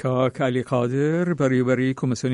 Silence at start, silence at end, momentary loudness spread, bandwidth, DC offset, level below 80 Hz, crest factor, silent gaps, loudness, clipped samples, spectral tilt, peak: 0 s; 0 s; 3 LU; 10.5 kHz; under 0.1%; -60 dBFS; 14 dB; none; -22 LUFS; under 0.1%; -7 dB/octave; -8 dBFS